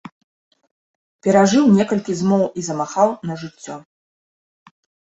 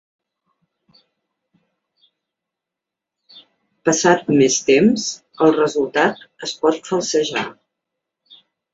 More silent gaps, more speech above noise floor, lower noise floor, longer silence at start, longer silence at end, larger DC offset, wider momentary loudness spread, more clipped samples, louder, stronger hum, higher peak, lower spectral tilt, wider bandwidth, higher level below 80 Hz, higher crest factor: neither; first, over 73 dB vs 68 dB; first, under -90 dBFS vs -85 dBFS; second, 1.25 s vs 3.35 s; first, 1.35 s vs 1.2 s; neither; first, 19 LU vs 11 LU; neither; about the same, -17 LUFS vs -17 LUFS; neither; about the same, -2 dBFS vs 0 dBFS; first, -6 dB/octave vs -4 dB/octave; about the same, 8 kHz vs 8 kHz; about the same, -60 dBFS vs -62 dBFS; about the same, 18 dB vs 20 dB